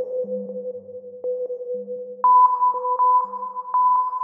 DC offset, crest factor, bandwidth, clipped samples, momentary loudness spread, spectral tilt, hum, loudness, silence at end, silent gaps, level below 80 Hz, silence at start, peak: under 0.1%; 14 dB; 1.8 kHz; under 0.1%; 18 LU; -10 dB/octave; none; -20 LUFS; 0 s; none; under -90 dBFS; 0 s; -6 dBFS